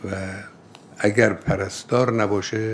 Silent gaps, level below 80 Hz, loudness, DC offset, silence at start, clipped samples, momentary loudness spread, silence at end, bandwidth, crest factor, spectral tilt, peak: none; -48 dBFS; -22 LUFS; under 0.1%; 0 s; under 0.1%; 14 LU; 0 s; 11 kHz; 22 dB; -5.5 dB/octave; -2 dBFS